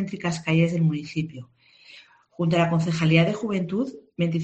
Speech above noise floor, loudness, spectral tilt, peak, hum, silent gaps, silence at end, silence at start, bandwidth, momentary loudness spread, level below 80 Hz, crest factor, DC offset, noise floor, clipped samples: 28 dB; -24 LUFS; -7 dB/octave; -4 dBFS; none; none; 0 s; 0 s; 8.4 kHz; 11 LU; -60 dBFS; 20 dB; under 0.1%; -51 dBFS; under 0.1%